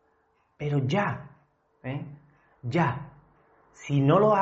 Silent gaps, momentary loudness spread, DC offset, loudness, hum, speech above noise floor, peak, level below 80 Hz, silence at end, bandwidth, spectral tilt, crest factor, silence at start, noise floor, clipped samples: none; 21 LU; under 0.1%; -27 LUFS; none; 44 dB; -10 dBFS; -62 dBFS; 0 s; 7.6 kHz; -6.5 dB/octave; 18 dB; 0.6 s; -69 dBFS; under 0.1%